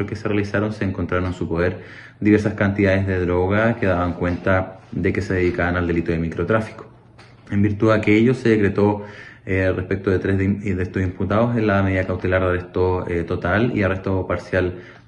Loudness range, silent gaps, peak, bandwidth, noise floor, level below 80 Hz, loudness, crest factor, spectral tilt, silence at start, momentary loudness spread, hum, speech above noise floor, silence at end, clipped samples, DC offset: 2 LU; none; -2 dBFS; 8.6 kHz; -46 dBFS; -44 dBFS; -20 LUFS; 18 dB; -8 dB/octave; 0 s; 7 LU; none; 27 dB; 0.1 s; under 0.1%; under 0.1%